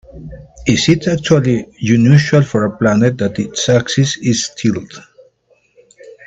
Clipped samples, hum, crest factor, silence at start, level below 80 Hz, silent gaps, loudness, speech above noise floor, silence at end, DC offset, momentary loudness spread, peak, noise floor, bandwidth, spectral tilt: under 0.1%; none; 14 dB; 0.15 s; -44 dBFS; none; -14 LUFS; 42 dB; 0.15 s; under 0.1%; 12 LU; 0 dBFS; -56 dBFS; 8.4 kHz; -5.5 dB/octave